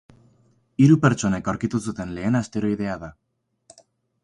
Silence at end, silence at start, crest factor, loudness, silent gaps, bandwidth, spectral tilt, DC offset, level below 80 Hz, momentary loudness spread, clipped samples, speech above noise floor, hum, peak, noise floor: 1.1 s; 0.8 s; 18 dB; -22 LUFS; none; 11 kHz; -7 dB/octave; under 0.1%; -50 dBFS; 16 LU; under 0.1%; 40 dB; none; -4 dBFS; -61 dBFS